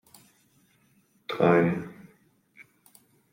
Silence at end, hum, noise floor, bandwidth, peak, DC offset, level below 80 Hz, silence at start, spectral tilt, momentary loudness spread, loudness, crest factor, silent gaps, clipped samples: 1.4 s; none; -65 dBFS; 16 kHz; -6 dBFS; under 0.1%; -70 dBFS; 1.3 s; -7.5 dB/octave; 22 LU; -25 LUFS; 24 dB; none; under 0.1%